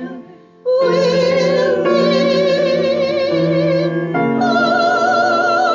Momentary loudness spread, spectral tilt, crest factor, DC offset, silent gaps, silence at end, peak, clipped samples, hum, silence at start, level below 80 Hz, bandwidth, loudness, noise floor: 4 LU; -6 dB/octave; 12 dB; under 0.1%; none; 0 s; -4 dBFS; under 0.1%; none; 0 s; -58 dBFS; 7.6 kHz; -15 LUFS; -38 dBFS